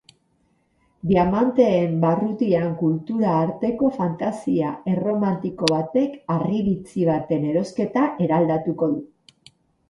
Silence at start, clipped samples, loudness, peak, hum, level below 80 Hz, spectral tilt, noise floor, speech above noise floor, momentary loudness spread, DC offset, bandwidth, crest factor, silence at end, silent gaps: 1.05 s; under 0.1%; -22 LUFS; 0 dBFS; none; -54 dBFS; -7.5 dB/octave; -65 dBFS; 44 dB; 6 LU; under 0.1%; 11.5 kHz; 22 dB; 0.85 s; none